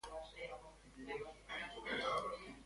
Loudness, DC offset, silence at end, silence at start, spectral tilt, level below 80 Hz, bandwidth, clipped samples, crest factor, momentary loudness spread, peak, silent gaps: -45 LUFS; under 0.1%; 0 s; 0.05 s; -3.5 dB/octave; -66 dBFS; 11.5 kHz; under 0.1%; 18 dB; 15 LU; -28 dBFS; none